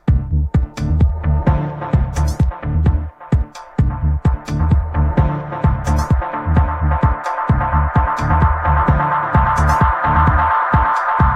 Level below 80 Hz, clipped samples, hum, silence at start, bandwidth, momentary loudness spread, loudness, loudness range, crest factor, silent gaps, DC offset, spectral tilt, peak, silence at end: -20 dBFS; under 0.1%; none; 0.05 s; 9.6 kHz; 6 LU; -17 LUFS; 4 LU; 14 dB; none; under 0.1%; -8 dB/octave; -2 dBFS; 0 s